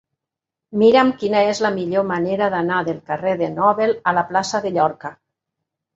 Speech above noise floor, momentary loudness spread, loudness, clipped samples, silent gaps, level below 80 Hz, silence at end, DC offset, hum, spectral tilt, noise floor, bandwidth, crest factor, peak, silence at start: 67 dB; 8 LU; -19 LUFS; under 0.1%; none; -64 dBFS; 0.85 s; under 0.1%; none; -5.5 dB/octave; -85 dBFS; 8 kHz; 18 dB; -2 dBFS; 0.7 s